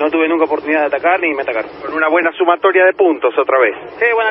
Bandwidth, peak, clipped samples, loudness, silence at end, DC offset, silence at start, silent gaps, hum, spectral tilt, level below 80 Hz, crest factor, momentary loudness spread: 5.6 kHz; 0 dBFS; under 0.1%; -14 LUFS; 0 s; under 0.1%; 0 s; none; none; -8 dB/octave; -58 dBFS; 14 dB; 6 LU